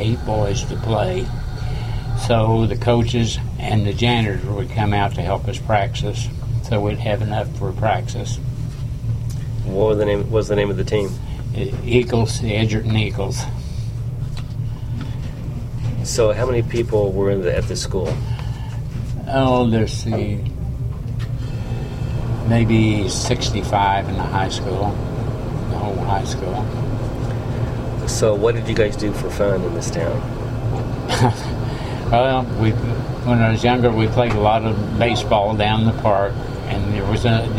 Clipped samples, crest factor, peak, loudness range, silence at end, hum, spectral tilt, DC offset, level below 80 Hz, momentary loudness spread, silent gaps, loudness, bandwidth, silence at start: under 0.1%; 18 dB; -2 dBFS; 5 LU; 0 s; none; -6 dB/octave; under 0.1%; -30 dBFS; 10 LU; none; -20 LUFS; 13 kHz; 0 s